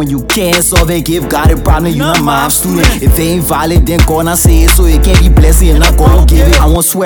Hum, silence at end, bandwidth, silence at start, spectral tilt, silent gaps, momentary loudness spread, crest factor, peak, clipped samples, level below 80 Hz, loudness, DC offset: none; 0 s; over 20 kHz; 0 s; -4.5 dB/octave; none; 4 LU; 6 dB; 0 dBFS; under 0.1%; -10 dBFS; -8 LUFS; under 0.1%